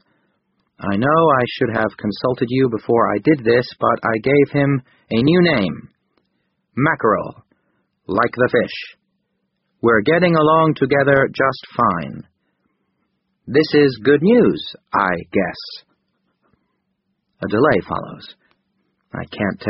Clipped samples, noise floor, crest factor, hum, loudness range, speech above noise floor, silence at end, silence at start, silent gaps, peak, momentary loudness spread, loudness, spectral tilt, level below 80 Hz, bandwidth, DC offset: under 0.1%; -71 dBFS; 18 dB; none; 6 LU; 55 dB; 0 s; 0.8 s; none; 0 dBFS; 17 LU; -17 LUFS; -5 dB/octave; -52 dBFS; 5.8 kHz; under 0.1%